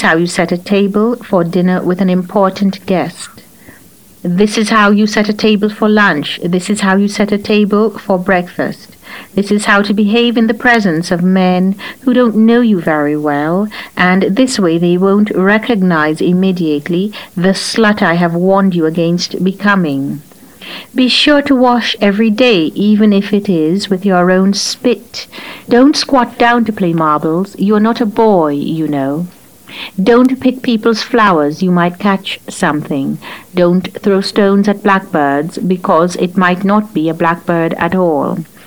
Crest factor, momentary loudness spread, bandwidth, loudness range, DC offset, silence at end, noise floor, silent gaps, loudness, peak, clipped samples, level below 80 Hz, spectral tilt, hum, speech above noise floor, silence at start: 12 dB; 9 LU; 19.5 kHz; 3 LU; 0.4%; 0.2 s; -41 dBFS; none; -12 LUFS; 0 dBFS; under 0.1%; -48 dBFS; -5.5 dB/octave; none; 30 dB; 0 s